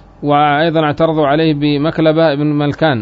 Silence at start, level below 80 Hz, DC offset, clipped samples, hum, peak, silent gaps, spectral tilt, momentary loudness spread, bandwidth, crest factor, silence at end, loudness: 0.2 s; -44 dBFS; under 0.1%; under 0.1%; none; -2 dBFS; none; -8.5 dB/octave; 3 LU; 5.8 kHz; 12 dB; 0 s; -13 LUFS